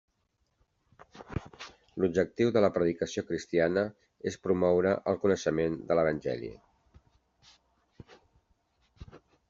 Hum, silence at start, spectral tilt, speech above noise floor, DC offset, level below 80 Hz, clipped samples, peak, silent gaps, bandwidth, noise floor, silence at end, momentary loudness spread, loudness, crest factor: none; 1.15 s; -6 dB/octave; 48 dB; under 0.1%; -60 dBFS; under 0.1%; -10 dBFS; none; 7.6 kHz; -76 dBFS; 0.3 s; 15 LU; -30 LUFS; 20 dB